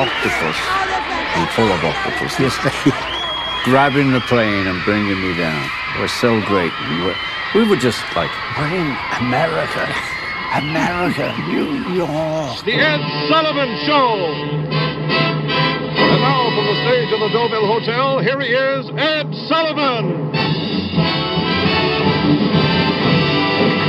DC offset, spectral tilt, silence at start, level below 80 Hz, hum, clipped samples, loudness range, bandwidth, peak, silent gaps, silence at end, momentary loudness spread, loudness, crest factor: under 0.1%; -5.5 dB/octave; 0 s; -44 dBFS; none; under 0.1%; 3 LU; 13.5 kHz; -2 dBFS; none; 0 s; 5 LU; -17 LUFS; 16 dB